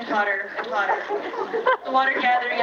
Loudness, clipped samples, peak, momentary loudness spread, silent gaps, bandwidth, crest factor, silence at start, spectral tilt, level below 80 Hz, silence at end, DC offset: -23 LUFS; under 0.1%; -6 dBFS; 8 LU; none; 7.2 kHz; 16 dB; 0 s; -3.5 dB/octave; -72 dBFS; 0 s; under 0.1%